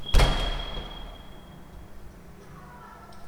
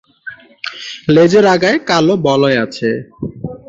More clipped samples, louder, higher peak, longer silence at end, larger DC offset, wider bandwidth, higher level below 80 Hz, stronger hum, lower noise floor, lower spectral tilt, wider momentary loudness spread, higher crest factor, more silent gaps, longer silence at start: neither; second, -29 LUFS vs -12 LUFS; second, -6 dBFS vs 0 dBFS; about the same, 0 s vs 0.1 s; neither; first, 14.5 kHz vs 7.8 kHz; first, -30 dBFS vs -50 dBFS; neither; first, -46 dBFS vs -34 dBFS; about the same, -4.5 dB/octave vs -5.5 dB/octave; first, 24 LU vs 18 LU; first, 22 dB vs 14 dB; neither; second, 0 s vs 0.25 s